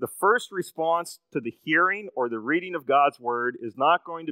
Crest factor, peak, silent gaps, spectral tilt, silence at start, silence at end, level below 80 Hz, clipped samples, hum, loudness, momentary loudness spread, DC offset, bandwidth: 18 dB; -8 dBFS; none; -4 dB/octave; 0 s; 0 s; -84 dBFS; under 0.1%; none; -25 LUFS; 11 LU; under 0.1%; 16 kHz